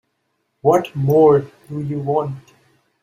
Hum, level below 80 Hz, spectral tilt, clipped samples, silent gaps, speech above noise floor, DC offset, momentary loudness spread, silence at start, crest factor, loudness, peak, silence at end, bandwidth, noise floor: none; -58 dBFS; -8.5 dB/octave; under 0.1%; none; 54 dB; under 0.1%; 16 LU; 0.65 s; 16 dB; -17 LUFS; -2 dBFS; 0.65 s; 15 kHz; -70 dBFS